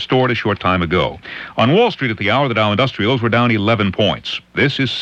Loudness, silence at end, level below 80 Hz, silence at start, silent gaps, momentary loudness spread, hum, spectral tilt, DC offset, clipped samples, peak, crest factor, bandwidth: -16 LUFS; 0 s; -44 dBFS; 0 s; none; 6 LU; none; -7 dB/octave; under 0.1%; under 0.1%; -2 dBFS; 14 dB; 8 kHz